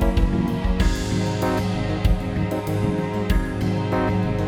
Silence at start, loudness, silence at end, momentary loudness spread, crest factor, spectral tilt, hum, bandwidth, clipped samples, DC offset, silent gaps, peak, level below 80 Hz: 0 s; -23 LUFS; 0 s; 3 LU; 14 dB; -7 dB/octave; none; 17 kHz; under 0.1%; under 0.1%; none; -6 dBFS; -26 dBFS